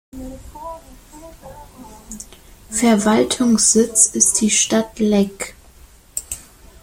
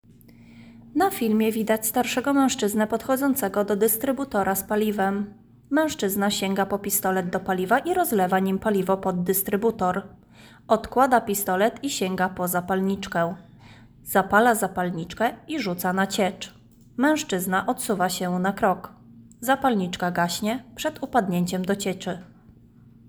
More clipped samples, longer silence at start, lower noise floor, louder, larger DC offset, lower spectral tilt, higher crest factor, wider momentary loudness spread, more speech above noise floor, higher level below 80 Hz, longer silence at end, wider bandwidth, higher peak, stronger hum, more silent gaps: neither; second, 0.15 s vs 0.55 s; second, -46 dBFS vs -51 dBFS; first, -15 LUFS vs -24 LUFS; neither; second, -3 dB/octave vs -4.5 dB/octave; about the same, 20 dB vs 20 dB; first, 22 LU vs 8 LU; about the same, 29 dB vs 28 dB; first, -46 dBFS vs -56 dBFS; second, 0.4 s vs 0.85 s; second, 16.5 kHz vs over 20 kHz; first, 0 dBFS vs -6 dBFS; neither; neither